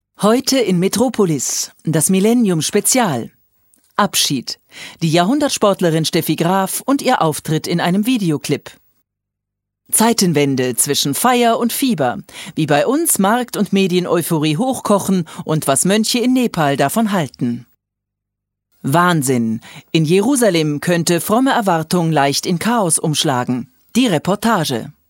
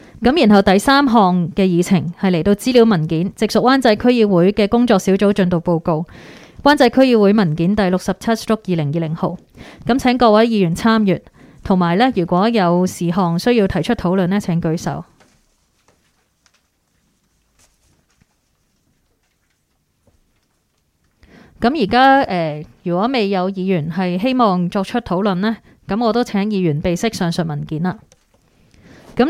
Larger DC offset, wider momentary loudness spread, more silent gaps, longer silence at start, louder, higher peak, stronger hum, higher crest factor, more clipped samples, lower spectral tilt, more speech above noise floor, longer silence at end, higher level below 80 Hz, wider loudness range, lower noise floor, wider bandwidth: neither; about the same, 8 LU vs 10 LU; neither; about the same, 0.2 s vs 0.15 s; about the same, -16 LUFS vs -16 LUFS; about the same, 0 dBFS vs 0 dBFS; neither; about the same, 16 dB vs 16 dB; neither; second, -4.5 dB/octave vs -6.5 dB/octave; first, 64 dB vs 50 dB; first, 0.2 s vs 0 s; second, -58 dBFS vs -44 dBFS; second, 3 LU vs 6 LU; first, -79 dBFS vs -65 dBFS; about the same, 16.5 kHz vs 15.5 kHz